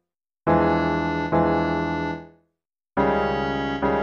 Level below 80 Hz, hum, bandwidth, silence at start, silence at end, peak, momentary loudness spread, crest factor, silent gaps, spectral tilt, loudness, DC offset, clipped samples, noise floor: -42 dBFS; none; 7 kHz; 0.45 s; 0 s; -8 dBFS; 9 LU; 14 dB; none; -8 dB/octave; -23 LUFS; under 0.1%; under 0.1%; -80 dBFS